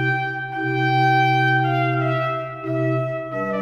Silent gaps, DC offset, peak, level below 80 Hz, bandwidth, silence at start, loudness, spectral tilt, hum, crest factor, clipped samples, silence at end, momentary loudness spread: none; under 0.1%; -8 dBFS; -58 dBFS; 6.6 kHz; 0 s; -20 LUFS; -7.5 dB/octave; none; 14 dB; under 0.1%; 0 s; 9 LU